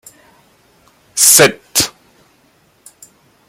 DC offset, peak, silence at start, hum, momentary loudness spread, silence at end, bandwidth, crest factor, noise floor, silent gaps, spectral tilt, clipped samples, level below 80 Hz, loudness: under 0.1%; 0 dBFS; 1.15 s; none; 14 LU; 1.6 s; over 20 kHz; 18 dB; -54 dBFS; none; -1 dB/octave; 0.2%; -54 dBFS; -10 LUFS